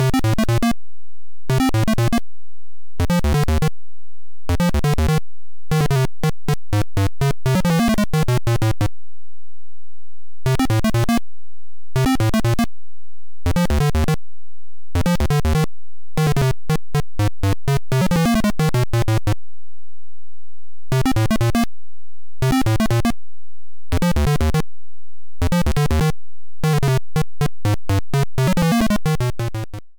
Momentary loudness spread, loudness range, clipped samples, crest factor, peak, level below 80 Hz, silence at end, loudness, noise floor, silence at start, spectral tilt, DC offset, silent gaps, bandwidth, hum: 8 LU; 2 LU; under 0.1%; 8 dB; -12 dBFS; -28 dBFS; 0 s; -20 LUFS; -68 dBFS; 0 s; -6.5 dB/octave; 10%; none; over 20 kHz; 60 Hz at -45 dBFS